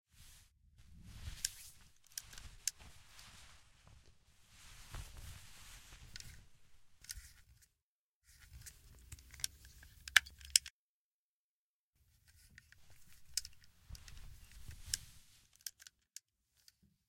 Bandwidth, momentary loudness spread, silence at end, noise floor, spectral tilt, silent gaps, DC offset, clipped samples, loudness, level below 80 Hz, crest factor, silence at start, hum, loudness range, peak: 16.5 kHz; 28 LU; 0.9 s; under -90 dBFS; 1 dB/octave; 7.82-8.21 s, 10.70-11.93 s; under 0.1%; under 0.1%; -39 LUFS; -62 dBFS; 42 dB; 0.15 s; none; 19 LU; -4 dBFS